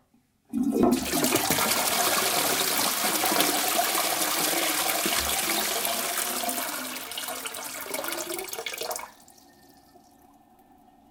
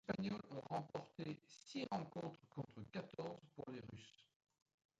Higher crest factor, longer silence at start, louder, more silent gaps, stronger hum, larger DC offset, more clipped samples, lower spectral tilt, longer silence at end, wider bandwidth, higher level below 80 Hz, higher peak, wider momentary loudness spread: about the same, 24 dB vs 24 dB; first, 0.55 s vs 0.05 s; first, -25 LUFS vs -50 LUFS; neither; neither; neither; neither; second, -1.5 dB/octave vs -6.5 dB/octave; first, 2 s vs 0.75 s; first, 19 kHz vs 9 kHz; first, -58 dBFS vs -78 dBFS; first, -4 dBFS vs -26 dBFS; about the same, 10 LU vs 9 LU